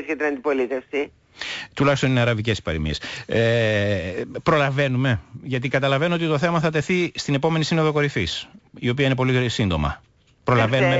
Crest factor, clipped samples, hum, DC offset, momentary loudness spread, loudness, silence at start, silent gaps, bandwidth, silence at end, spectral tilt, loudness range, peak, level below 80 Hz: 14 dB; under 0.1%; none; under 0.1%; 10 LU; -22 LUFS; 0 s; none; 8 kHz; 0 s; -6 dB/octave; 1 LU; -8 dBFS; -42 dBFS